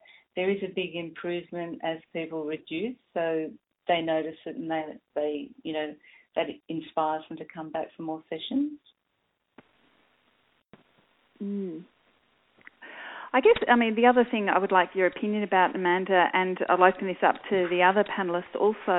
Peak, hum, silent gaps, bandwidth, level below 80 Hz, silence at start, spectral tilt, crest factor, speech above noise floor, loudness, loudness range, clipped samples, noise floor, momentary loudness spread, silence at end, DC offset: -4 dBFS; none; none; 4.1 kHz; -68 dBFS; 0.35 s; -9.5 dB/octave; 24 dB; 50 dB; -27 LUFS; 18 LU; under 0.1%; -77 dBFS; 15 LU; 0 s; under 0.1%